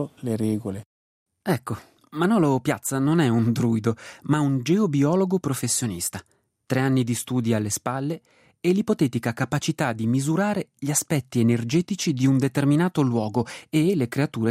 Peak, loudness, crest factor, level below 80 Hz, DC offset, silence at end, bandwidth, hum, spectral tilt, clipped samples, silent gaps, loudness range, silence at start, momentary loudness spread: -8 dBFS; -23 LUFS; 16 dB; -62 dBFS; under 0.1%; 0 s; 16 kHz; none; -5.5 dB/octave; under 0.1%; 0.86-1.26 s; 3 LU; 0 s; 8 LU